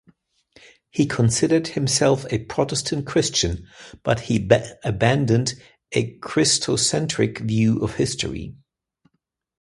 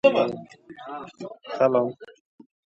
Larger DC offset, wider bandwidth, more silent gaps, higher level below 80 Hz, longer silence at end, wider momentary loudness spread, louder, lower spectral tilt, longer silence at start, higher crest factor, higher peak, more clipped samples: neither; first, 11.5 kHz vs 7.8 kHz; neither; first, -46 dBFS vs -72 dBFS; first, 1.1 s vs 0.7 s; second, 10 LU vs 21 LU; first, -21 LUFS vs -24 LUFS; second, -4.5 dB/octave vs -6.5 dB/octave; first, 0.95 s vs 0.05 s; about the same, 22 dB vs 22 dB; first, 0 dBFS vs -4 dBFS; neither